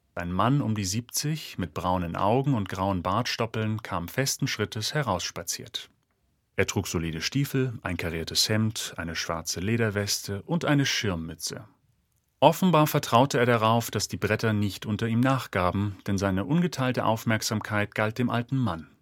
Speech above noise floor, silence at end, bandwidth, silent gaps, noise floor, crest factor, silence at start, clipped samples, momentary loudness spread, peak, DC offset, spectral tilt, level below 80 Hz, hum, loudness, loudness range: 45 dB; 0.15 s; 17.5 kHz; none; -72 dBFS; 24 dB; 0.15 s; under 0.1%; 9 LU; -2 dBFS; under 0.1%; -4.5 dB/octave; -54 dBFS; none; -27 LUFS; 5 LU